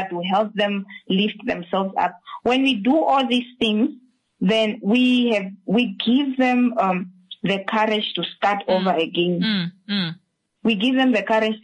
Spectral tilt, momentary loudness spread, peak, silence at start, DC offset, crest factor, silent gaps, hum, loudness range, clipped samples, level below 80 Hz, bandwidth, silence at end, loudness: -6.5 dB/octave; 7 LU; -8 dBFS; 0 s; under 0.1%; 12 dB; none; none; 2 LU; under 0.1%; -64 dBFS; 9.6 kHz; 0.05 s; -21 LUFS